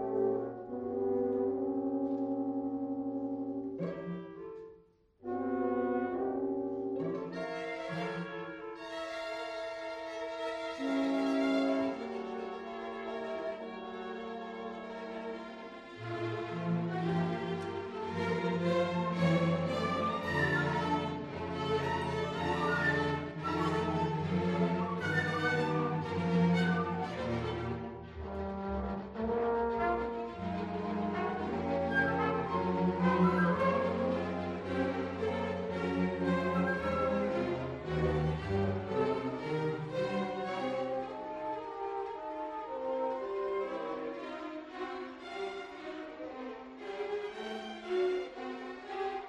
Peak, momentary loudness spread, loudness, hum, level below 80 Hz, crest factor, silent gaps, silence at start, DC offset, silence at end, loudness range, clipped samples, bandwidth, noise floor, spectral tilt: -16 dBFS; 12 LU; -35 LUFS; none; -56 dBFS; 18 dB; none; 0 s; under 0.1%; 0 s; 8 LU; under 0.1%; 9.6 kHz; -63 dBFS; -7.5 dB/octave